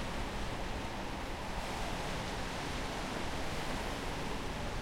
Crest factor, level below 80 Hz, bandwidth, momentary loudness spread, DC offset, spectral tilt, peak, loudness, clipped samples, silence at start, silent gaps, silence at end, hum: 14 dB; -44 dBFS; 16.5 kHz; 2 LU; under 0.1%; -4.5 dB/octave; -24 dBFS; -39 LUFS; under 0.1%; 0 s; none; 0 s; none